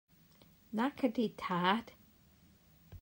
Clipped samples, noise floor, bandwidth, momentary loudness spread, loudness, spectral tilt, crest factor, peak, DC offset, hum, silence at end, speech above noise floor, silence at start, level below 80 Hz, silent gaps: under 0.1%; -65 dBFS; 16 kHz; 8 LU; -35 LUFS; -6.5 dB/octave; 20 dB; -18 dBFS; under 0.1%; none; 0.05 s; 31 dB; 0.7 s; -70 dBFS; none